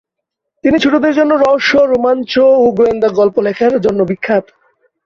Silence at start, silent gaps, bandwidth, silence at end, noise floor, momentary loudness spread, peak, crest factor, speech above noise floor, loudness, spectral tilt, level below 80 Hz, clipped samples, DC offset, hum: 0.65 s; none; 7.4 kHz; 0.65 s; -77 dBFS; 6 LU; 0 dBFS; 12 dB; 66 dB; -12 LUFS; -6 dB/octave; -48 dBFS; under 0.1%; under 0.1%; none